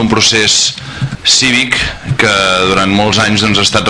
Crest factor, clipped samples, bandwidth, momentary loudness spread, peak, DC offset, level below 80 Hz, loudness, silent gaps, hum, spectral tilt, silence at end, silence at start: 10 dB; 0.2%; 11 kHz; 7 LU; 0 dBFS; under 0.1%; -34 dBFS; -9 LUFS; none; none; -2.5 dB/octave; 0 s; 0 s